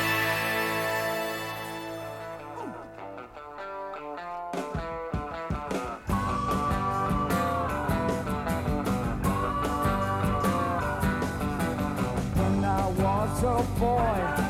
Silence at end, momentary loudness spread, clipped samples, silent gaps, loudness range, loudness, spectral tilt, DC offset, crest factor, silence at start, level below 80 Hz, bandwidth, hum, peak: 0 s; 12 LU; under 0.1%; none; 9 LU; -29 LUFS; -6 dB/octave; under 0.1%; 14 dB; 0 s; -40 dBFS; 18 kHz; none; -14 dBFS